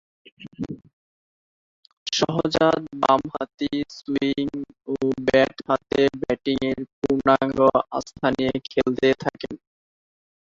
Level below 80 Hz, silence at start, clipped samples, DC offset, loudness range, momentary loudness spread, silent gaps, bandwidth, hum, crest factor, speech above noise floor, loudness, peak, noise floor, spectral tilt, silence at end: -52 dBFS; 0.4 s; under 0.1%; under 0.1%; 3 LU; 15 LU; 0.93-1.83 s, 1.93-2.06 s, 6.93-7.02 s; 7.8 kHz; none; 20 dB; over 68 dB; -23 LUFS; -2 dBFS; under -90 dBFS; -5 dB/octave; 0.85 s